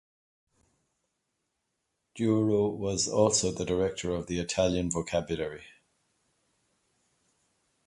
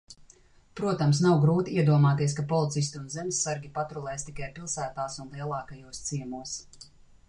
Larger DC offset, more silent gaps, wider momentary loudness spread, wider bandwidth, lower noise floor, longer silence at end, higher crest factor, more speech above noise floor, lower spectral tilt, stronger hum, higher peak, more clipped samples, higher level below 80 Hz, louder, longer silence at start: neither; neither; second, 9 LU vs 15 LU; about the same, 11.5 kHz vs 10.5 kHz; first, -81 dBFS vs -58 dBFS; first, 2.2 s vs 0.45 s; about the same, 22 dB vs 18 dB; first, 53 dB vs 30 dB; about the same, -4.5 dB/octave vs -5.5 dB/octave; neither; about the same, -10 dBFS vs -12 dBFS; neither; about the same, -54 dBFS vs -58 dBFS; about the same, -29 LUFS vs -28 LUFS; first, 2.15 s vs 0.1 s